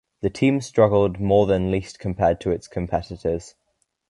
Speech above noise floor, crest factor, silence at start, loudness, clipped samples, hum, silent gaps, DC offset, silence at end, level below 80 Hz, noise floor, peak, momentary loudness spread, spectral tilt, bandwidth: 51 dB; 18 dB; 0.25 s; -22 LUFS; under 0.1%; none; none; under 0.1%; 0.6 s; -42 dBFS; -72 dBFS; -4 dBFS; 9 LU; -7 dB/octave; 11.5 kHz